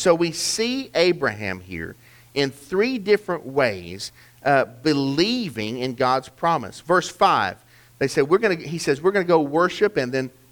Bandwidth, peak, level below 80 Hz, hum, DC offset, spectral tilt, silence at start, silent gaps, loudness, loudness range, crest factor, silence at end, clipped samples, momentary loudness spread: 20 kHz; -4 dBFS; -56 dBFS; none; under 0.1%; -4.5 dB/octave; 0 s; none; -22 LUFS; 3 LU; 18 dB; 0.2 s; under 0.1%; 11 LU